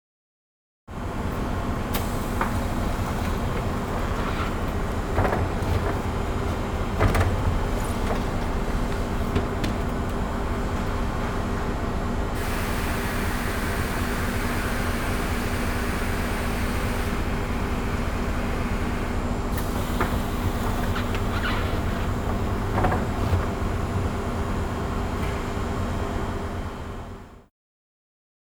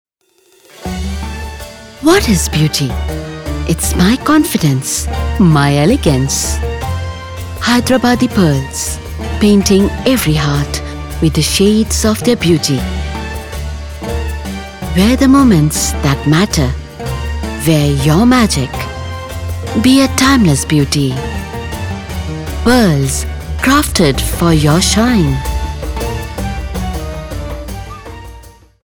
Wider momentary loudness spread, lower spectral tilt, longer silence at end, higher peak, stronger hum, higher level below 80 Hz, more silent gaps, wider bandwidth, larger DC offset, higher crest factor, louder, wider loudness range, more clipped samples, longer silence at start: second, 3 LU vs 14 LU; about the same, -6 dB/octave vs -5 dB/octave; first, 1.1 s vs 0.35 s; second, -8 dBFS vs 0 dBFS; neither; second, -30 dBFS vs -24 dBFS; neither; about the same, over 20 kHz vs over 20 kHz; neither; first, 18 dB vs 12 dB; second, -27 LUFS vs -13 LUFS; about the same, 2 LU vs 4 LU; neither; first, 0.9 s vs 0.75 s